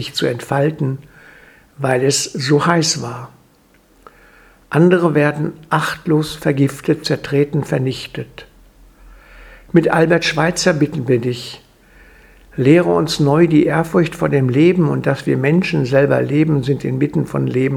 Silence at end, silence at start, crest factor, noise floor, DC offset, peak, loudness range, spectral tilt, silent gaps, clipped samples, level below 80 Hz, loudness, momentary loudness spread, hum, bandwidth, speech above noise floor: 0 s; 0 s; 16 dB; -52 dBFS; under 0.1%; 0 dBFS; 4 LU; -5.5 dB/octave; none; under 0.1%; -48 dBFS; -16 LUFS; 10 LU; none; 15.5 kHz; 37 dB